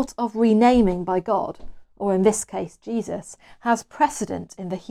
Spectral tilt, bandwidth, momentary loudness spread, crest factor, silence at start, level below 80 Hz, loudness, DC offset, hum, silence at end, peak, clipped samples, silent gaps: -5.5 dB/octave; 13.5 kHz; 15 LU; 18 dB; 0 s; -46 dBFS; -22 LUFS; under 0.1%; none; 0.1 s; -4 dBFS; under 0.1%; none